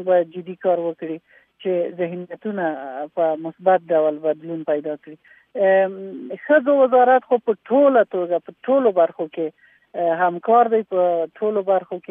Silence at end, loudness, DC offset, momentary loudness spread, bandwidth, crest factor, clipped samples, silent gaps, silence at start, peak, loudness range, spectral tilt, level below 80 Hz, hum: 0.1 s; -20 LUFS; under 0.1%; 14 LU; 3.7 kHz; 16 dB; under 0.1%; none; 0 s; -4 dBFS; 6 LU; -10 dB/octave; -80 dBFS; none